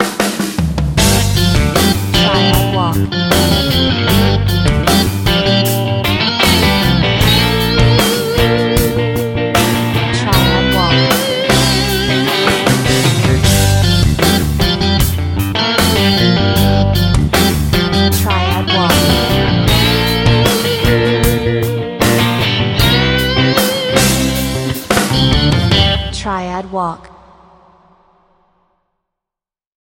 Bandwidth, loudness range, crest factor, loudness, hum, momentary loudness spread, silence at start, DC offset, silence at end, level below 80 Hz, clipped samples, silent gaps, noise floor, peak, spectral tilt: 17 kHz; 3 LU; 12 dB; -12 LUFS; none; 5 LU; 0 s; under 0.1%; 3 s; -24 dBFS; under 0.1%; none; -87 dBFS; 0 dBFS; -4.5 dB/octave